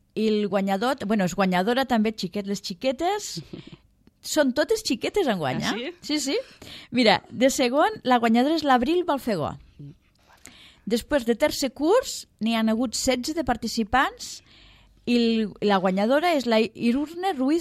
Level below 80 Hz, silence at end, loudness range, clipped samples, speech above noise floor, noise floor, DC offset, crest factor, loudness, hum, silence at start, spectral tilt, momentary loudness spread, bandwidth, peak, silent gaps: -52 dBFS; 0 s; 4 LU; under 0.1%; 35 dB; -58 dBFS; under 0.1%; 18 dB; -24 LUFS; none; 0.15 s; -4.5 dB/octave; 10 LU; 15.5 kHz; -6 dBFS; none